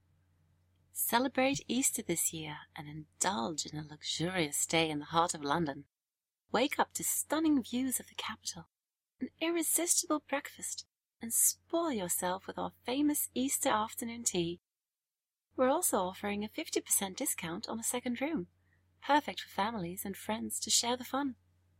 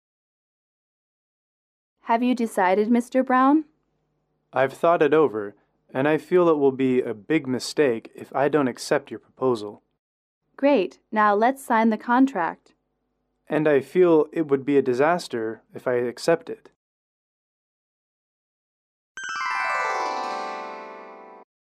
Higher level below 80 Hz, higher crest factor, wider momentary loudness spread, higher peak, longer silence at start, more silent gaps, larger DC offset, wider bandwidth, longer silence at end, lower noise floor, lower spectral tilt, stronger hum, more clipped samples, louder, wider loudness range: about the same, -76 dBFS vs -74 dBFS; first, 22 dB vs 16 dB; about the same, 12 LU vs 14 LU; second, -14 dBFS vs -8 dBFS; second, 0.95 s vs 2.05 s; second, none vs 9.99-10.41 s, 16.76-19.15 s; neither; first, 16 kHz vs 14 kHz; about the same, 0.45 s vs 0.4 s; first, under -90 dBFS vs -74 dBFS; second, -2.5 dB/octave vs -6 dB/octave; neither; neither; second, -33 LUFS vs -22 LUFS; second, 2 LU vs 8 LU